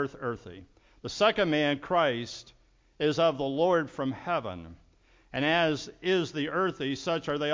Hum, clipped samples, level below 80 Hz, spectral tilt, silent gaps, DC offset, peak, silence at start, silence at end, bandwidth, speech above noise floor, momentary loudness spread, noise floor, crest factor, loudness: none; under 0.1%; -60 dBFS; -5 dB/octave; none; under 0.1%; -10 dBFS; 0 s; 0 s; 7.6 kHz; 30 dB; 15 LU; -58 dBFS; 18 dB; -28 LUFS